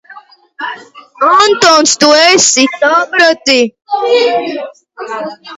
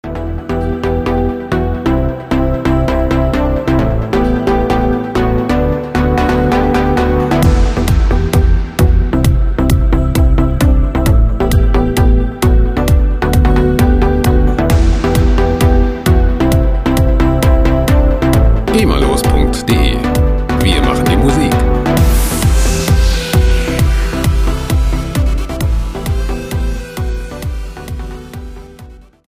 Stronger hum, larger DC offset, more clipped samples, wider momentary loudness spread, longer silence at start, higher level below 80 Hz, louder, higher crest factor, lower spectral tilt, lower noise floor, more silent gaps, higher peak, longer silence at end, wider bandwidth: neither; neither; first, 0.3% vs under 0.1%; first, 17 LU vs 7 LU; about the same, 0.1 s vs 0.05 s; second, -58 dBFS vs -14 dBFS; first, -8 LUFS vs -13 LUFS; about the same, 10 dB vs 12 dB; second, -1 dB/octave vs -6.5 dB/octave; about the same, -37 dBFS vs -35 dBFS; neither; about the same, 0 dBFS vs 0 dBFS; second, 0 s vs 0.3 s; about the same, 16 kHz vs 16 kHz